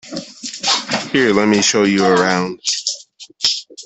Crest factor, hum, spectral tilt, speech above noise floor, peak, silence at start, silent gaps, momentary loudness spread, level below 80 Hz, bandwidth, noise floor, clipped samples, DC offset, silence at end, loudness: 16 dB; none; -3 dB/octave; 24 dB; 0 dBFS; 0.05 s; none; 13 LU; -56 dBFS; 8.4 kHz; -38 dBFS; under 0.1%; under 0.1%; 0 s; -15 LUFS